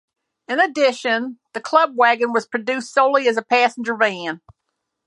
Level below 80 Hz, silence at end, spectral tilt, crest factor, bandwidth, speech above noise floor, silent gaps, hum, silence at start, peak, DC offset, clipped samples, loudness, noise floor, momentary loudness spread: -70 dBFS; 0.7 s; -3 dB/octave; 18 dB; 11 kHz; 58 dB; none; none; 0.5 s; -2 dBFS; under 0.1%; under 0.1%; -18 LUFS; -77 dBFS; 12 LU